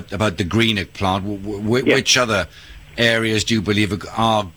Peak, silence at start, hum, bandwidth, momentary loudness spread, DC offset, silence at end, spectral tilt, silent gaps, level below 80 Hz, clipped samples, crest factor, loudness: -4 dBFS; 0 s; none; over 20 kHz; 9 LU; 0.2%; 0.05 s; -4 dB/octave; none; -44 dBFS; under 0.1%; 16 dB; -18 LUFS